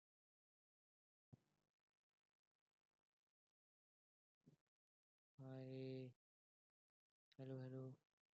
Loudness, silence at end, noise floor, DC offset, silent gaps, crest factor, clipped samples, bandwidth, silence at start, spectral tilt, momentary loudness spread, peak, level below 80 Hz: -56 LUFS; 0.35 s; under -90 dBFS; under 0.1%; 1.70-4.41 s, 4.61-5.38 s, 6.16-7.32 s; 20 dB; under 0.1%; 6.8 kHz; 1.3 s; -8 dB/octave; 8 LU; -42 dBFS; under -90 dBFS